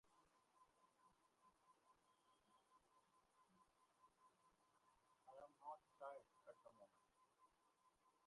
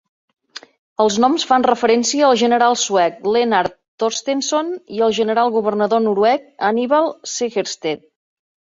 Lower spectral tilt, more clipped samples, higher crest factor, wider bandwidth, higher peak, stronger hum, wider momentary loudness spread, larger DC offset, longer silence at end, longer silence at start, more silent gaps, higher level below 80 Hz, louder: about the same, -3.5 dB/octave vs -3 dB/octave; neither; first, 24 dB vs 16 dB; first, 11 kHz vs 7.8 kHz; second, -44 dBFS vs -2 dBFS; neither; about the same, 9 LU vs 11 LU; neither; second, 0 s vs 0.75 s; second, 0.05 s vs 1 s; second, none vs 3.88-3.98 s; second, under -90 dBFS vs -62 dBFS; second, -63 LUFS vs -17 LUFS